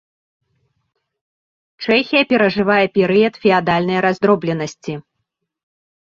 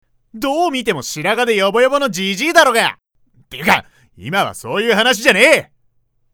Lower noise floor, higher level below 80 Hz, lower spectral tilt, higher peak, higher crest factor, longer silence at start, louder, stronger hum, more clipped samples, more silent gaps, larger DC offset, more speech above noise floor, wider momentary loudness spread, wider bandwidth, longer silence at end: first, -75 dBFS vs -60 dBFS; about the same, -56 dBFS vs -52 dBFS; first, -6 dB/octave vs -3 dB/octave; about the same, 0 dBFS vs 0 dBFS; about the same, 18 dB vs 16 dB; first, 1.8 s vs 0.35 s; about the same, -16 LUFS vs -14 LUFS; neither; neither; neither; neither; first, 60 dB vs 45 dB; first, 13 LU vs 10 LU; second, 7.6 kHz vs over 20 kHz; first, 1.15 s vs 0.7 s